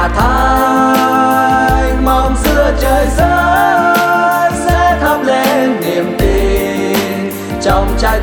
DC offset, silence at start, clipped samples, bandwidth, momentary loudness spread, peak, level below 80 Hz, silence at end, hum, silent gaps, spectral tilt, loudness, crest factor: under 0.1%; 0 s; under 0.1%; over 20 kHz; 5 LU; 0 dBFS; -18 dBFS; 0 s; none; none; -5 dB/octave; -11 LUFS; 10 dB